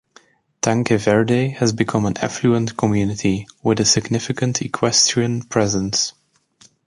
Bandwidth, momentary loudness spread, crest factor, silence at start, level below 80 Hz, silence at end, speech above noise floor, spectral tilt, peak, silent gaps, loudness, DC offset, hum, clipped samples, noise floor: 11.5 kHz; 7 LU; 18 dB; 0.65 s; -48 dBFS; 0.75 s; 35 dB; -4 dB/octave; -2 dBFS; none; -18 LUFS; under 0.1%; none; under 0.1%; -54 dBFS